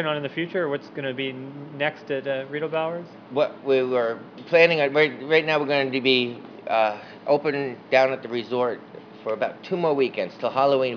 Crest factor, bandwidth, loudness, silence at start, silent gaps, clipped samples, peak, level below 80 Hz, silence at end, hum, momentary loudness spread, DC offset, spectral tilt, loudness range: 22 dB; 5.4 kHz; -23 LUFS; 0 s; none; under 0.1%; -2 dBFS; -82 dBFS; 0 s; none; 11 LU; under 0.1%; -6 dB/octave; 6 LU